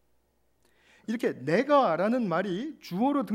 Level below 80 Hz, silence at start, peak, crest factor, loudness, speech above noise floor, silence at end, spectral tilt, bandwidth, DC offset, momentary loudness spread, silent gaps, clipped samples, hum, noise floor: -76 dBFS; 1.1 s; -10 dBFS; 18 dB; -27 LUFS; 43 dB; 0 s; -7 dB/octave; 16 kHz; under 0.1%; 13 LU; none; under 0.1%; none; -69 dBFS